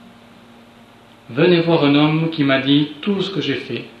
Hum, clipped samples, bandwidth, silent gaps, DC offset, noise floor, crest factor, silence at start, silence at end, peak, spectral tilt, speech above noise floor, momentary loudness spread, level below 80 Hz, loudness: none; under 0.1%; 7 kHz; none; under 0.1%; -46 dBFS; 16 dB; 1.3 s; 0.1 s; -2 dBFS; -7.5 dB/octave; 29 dB; 9 LU; -64 dBFS; -17 LUFS